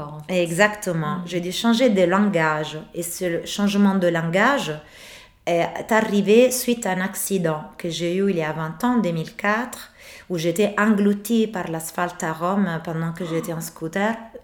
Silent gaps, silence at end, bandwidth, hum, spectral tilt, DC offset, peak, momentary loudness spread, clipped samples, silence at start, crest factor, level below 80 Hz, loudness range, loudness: none; 0.05 s; 19.5 kHz; none; -5 dB/octave; under 0.1%; -2 dBFS; 11 LU; under 0.1%; 0 s; 18 dB; -58 dBFS; 4 LU; -22 LUFS